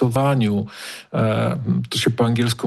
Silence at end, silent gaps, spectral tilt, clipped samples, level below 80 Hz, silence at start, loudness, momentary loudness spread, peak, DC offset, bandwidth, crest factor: 0 s; none; -6 dB/octave; under 0.1%; -52 dBFS; 0 s; -20 LUFS; 8 LU; -6 dBFS; under 0.1%; 12.5 kHz; 14 dB